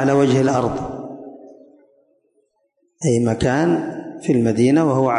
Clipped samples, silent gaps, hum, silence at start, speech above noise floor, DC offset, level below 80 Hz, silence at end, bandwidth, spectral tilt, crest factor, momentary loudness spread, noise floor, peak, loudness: under 0.1%; none; none; 0 s; 50 dB; under 0.1%; -46 dBFS; 0 s; 11 kHz; -7 dB/octave; 14 dB; 16 LU; -67 dBFS; -6 dBFS; -18 LUFS